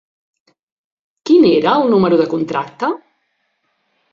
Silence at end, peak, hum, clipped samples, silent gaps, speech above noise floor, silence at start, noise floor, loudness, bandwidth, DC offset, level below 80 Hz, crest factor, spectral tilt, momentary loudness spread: 1.15 s; -2 dBFS; none; under 0.1%; none; 53 dB; 1.25 s; -67 dBFS; -14 LUFS; 7.2 kHz; under 0.1%; -60 dBFS; 14 dB; -7 dB/octave; 11 LU